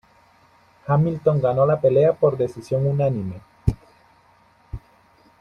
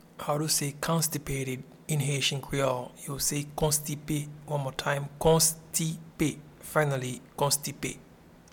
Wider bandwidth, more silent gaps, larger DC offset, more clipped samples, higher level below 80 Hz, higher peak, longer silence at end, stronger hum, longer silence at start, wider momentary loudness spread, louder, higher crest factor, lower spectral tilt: second, 9.4 kHz vs 19 kHz; neither; neither; neither; first, -42 dBFS vs -52 dBFS; first, -4 dBFS vs -10 dBFS; first, 0.65 s vs 0.5 s; neither; first, 0.85 s vs 0.15 s; first, 22 LU vs 10 LU; first, -21 LUFS vs -29 LUFS; about the same, 18 dB vs 20 dB; first, -9.5 dB/octave vs -3.5 dB/octave